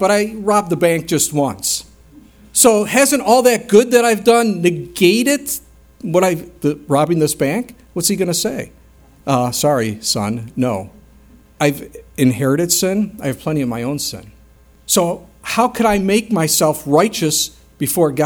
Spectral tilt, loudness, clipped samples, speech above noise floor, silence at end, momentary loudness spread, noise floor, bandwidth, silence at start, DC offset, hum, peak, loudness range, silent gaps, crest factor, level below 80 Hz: -4 dB/octave; -16 LUFS; under 0.1%; 31 dB; 0 s; 11 LU; -47 dBFS; over 20 kHz; 0 s; under 0.1%; none; 0 dBFS; 6 LU; none; 16 dB; -48 dBFS